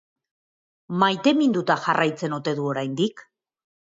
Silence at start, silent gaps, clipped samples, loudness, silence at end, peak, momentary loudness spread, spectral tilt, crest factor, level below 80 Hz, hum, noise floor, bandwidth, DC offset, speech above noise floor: 0.9 s; none; under 0.1%; -23 LUFS; 0.75 s; -6 dBFS; 7 LU; -5.5 dB/octave; 20 dB; -72 dBFS; none; under -90 dBFS; 7.8 kHz; under 0.1%; over 68 dB